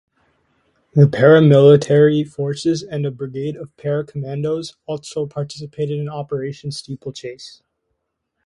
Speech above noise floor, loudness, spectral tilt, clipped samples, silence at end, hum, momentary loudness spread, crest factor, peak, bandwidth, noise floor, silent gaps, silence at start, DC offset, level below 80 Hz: 57 dB; -17 LUFS; -7.5 dB/octave; under 0.1%; 0.95 s; none; 18 LU; 18 dB; 0 dBFS; 11 kHz; -74 dBFS; none; 0.95 s; under 0.1%; -58 dBFS